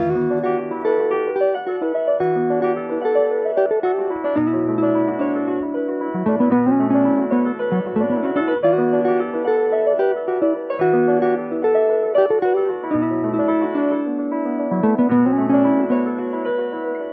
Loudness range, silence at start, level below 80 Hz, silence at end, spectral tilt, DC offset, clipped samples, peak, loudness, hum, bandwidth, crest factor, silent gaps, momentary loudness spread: 2 LU; 0 s; -60 dBFS; 0 s; -11 dB/octave; under 0.1%; under 0.1%; -4 dBFS; -19 LUFS; none; 4.7 kHz; 14 dB; none; 6 LU